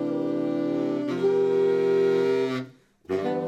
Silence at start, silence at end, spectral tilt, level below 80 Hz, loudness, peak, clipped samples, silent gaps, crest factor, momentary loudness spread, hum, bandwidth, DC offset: 0 s; 0 s; -7.5 dB/octave; -74 dBFS; -25 LUFS; -14 dBFS; under 0.1%; none; 12 dB; 8 LU; none; 8.4 kHz; under 0.1%